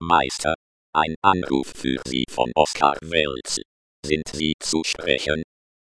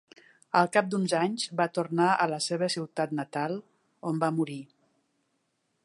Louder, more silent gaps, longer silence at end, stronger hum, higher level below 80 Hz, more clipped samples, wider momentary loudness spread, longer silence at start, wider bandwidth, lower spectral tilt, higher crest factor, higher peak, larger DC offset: first, -23 LUFS vs -28 LUFS; first, 0.55-0.93 s, 1.16-1.22 s, 3.65-4.03 s, 4.54-4.59 s vs none; second, 0.45 s vs 1.2 s; neither; first, -46 dBFS vs -80 dBFS; neither; about the same, 8 LU vs 10 LU; second, 0 s vs 0.55 s; about the same, 11 kHz vs 11.5 kHz; second, -3.5 dB/octave vs -5 dB/octave; about the same, 22 dB vs 22 dB; first, -2 dBFS vs -8 dBFS; first, 0.1% vs under 0.1%